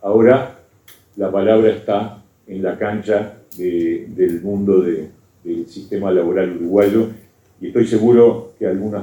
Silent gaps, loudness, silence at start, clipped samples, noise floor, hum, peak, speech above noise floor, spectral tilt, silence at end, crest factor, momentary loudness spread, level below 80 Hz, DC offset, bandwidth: none; -17 LUFS; 0 s; under 0.1%; -48 dBFS; none; 0 dBFS; 33 dB; -8 dB/octave; 0 s; 16 dB; 15 LU; -56 dBFS; under 0.1%; 19 kHz